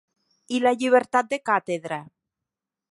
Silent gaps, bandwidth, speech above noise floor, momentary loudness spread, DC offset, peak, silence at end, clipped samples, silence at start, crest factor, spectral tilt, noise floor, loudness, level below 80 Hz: none; 11.5 kHz; 64 dB; 11 LU; under 0.1%; -6 dBFS; 0.85 s; under 0.1%; 0.5 s; 20 dB; -4.5 dB/octave; -87 dBFS; -23 LUFS; -76 dBFS